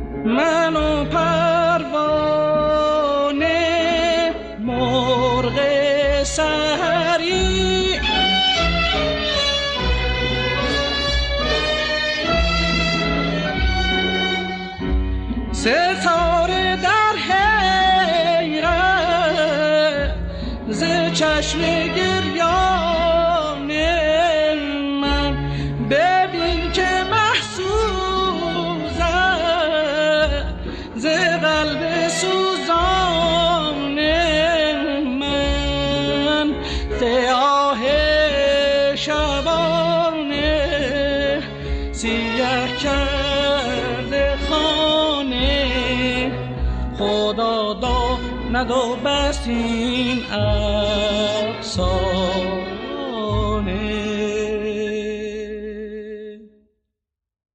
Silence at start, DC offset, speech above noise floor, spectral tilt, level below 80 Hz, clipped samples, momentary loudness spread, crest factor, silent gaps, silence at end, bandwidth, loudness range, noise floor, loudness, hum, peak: 0 s; under 0.1%; 64 dB; -4.5 dB/octave; -30 dBFS; under 0.1%; 7 LU; 14 dB; none; 1.05 s; 10 kHz; 4 LU; -82 dBFS; -19 LUFS; none; -6 dBFS